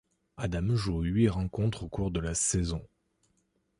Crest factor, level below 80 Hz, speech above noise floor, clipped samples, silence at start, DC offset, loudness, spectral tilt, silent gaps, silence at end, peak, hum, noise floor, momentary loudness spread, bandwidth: 18 dB; -42 dBFS; 45 dB; under 0.1%; 0.4 s; under 0.1%; -30 LUFS; -5.5 dB/octave; none; 0.95 s; -12 dBFS; none; -74 dBFS; 8 LU; 11.5 kHz